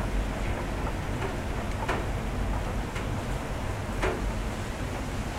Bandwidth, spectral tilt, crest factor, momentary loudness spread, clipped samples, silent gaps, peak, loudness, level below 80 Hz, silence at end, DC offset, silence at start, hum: 15.5 kHz; -5.5 dB/octave; 16 dB; 3 LU; under 0.1%; none; -14 dBFS; -32 LUFS; -34 dBFS; 0 s; under 0.1%; 0 s; none